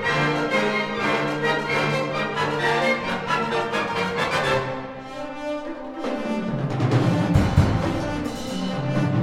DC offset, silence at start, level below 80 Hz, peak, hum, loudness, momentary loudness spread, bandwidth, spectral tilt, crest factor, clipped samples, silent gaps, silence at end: under 0.1%; 0 s; -40 dBFS; -4 dBFS; none; -23 LUFS; 10 LU; 15 kHz; -6 dB/octave; 18 dB; under 0.1%; none; 0 s